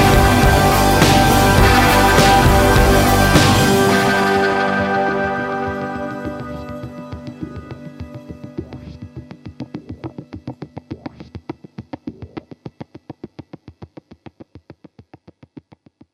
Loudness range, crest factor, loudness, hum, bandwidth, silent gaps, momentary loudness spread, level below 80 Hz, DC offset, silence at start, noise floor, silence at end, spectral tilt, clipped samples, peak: 23 LU; 16 dB; -13 LUFS; none; 16.5 kHz; none; 24 LU; -26 dBFS; under 0.1%; 0 s; -49 dBFS; 2.3 s; -5 dB/octave; under 0.1%; 0 dBFS